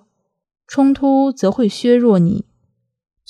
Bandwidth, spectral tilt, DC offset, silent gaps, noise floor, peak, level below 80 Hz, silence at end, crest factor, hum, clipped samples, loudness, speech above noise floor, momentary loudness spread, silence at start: 11 kHz; -7.5 dB/octave; under 0.1%; none; -66 dBFS; -2 dBFS; -52 dBFS; 0.85 s; 14 dB; none; under 0.1%; -15 LUFS; 52 dB; 7 LU; 0.7 s